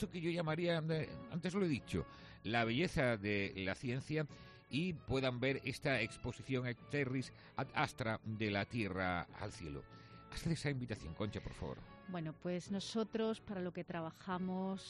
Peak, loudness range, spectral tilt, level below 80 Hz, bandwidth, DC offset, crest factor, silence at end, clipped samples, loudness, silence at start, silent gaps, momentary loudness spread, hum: -20 dBFS; 5 LU; -6 dB/octave; -62 dBFS; 11.5 kHz; under 0.1%; 20 dB; 0 s; under 0.1%; -40 LUFS; 0 s; none; 11 LU; none